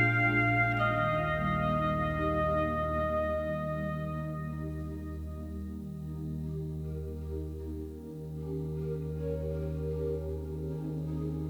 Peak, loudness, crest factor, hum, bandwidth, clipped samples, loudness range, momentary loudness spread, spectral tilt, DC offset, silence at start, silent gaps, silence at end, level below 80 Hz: -14 dBFS; -33 LUFS; 18 dB; none; 18.5 kHz; under 0.1%; 10 LU; 13 LU; -8 dB/octave; under 0.1%; 0 s; none; 0 s; -44 dBFS